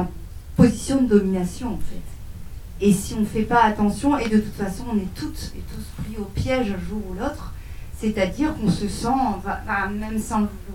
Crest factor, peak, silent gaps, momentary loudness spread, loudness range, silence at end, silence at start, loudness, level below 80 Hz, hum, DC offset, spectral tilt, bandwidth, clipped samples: 22 dB; 0 dBFS; none; 19 LU; 6 LU; 0 s; 0 s; -23 LUFS; -36 dBFS; none; under 0.1%; -6 dB/octave; 16.5 kHz; under 0.1%